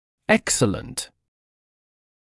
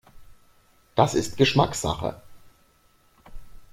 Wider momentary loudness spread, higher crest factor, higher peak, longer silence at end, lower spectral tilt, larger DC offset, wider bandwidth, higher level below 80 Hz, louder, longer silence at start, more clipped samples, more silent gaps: first, 13 LU vs 10 LU; about the same, 22 dB vs 24 dB; about the same, -4 dBFS vs -4 dBFS; first, 1.15 s vs 0.1 s; second, -3.5 dB/octave vs -5 dB/octave; neither; second, 12 kHz vs 16 kHz; about the same, -52 dBFS vs -48 dBFS; about the same, -22 LUFS vs -23 LUFS; first, 0.3 s vs 0.15 s; neither; neither